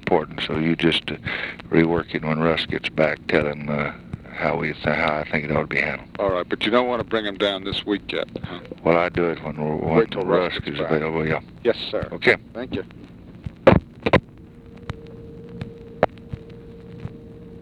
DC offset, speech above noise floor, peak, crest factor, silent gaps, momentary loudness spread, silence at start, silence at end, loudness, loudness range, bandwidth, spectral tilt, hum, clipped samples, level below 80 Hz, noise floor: under 0.1%; 21 dB; 0 dBFS; 22 dB; none; 18 LU; 0 s; 0 s; -22 LUFS; 2 LU; 11 kHz; -7 dB/octave; none; under 0.1%; -44 dBFS; -43 dBFS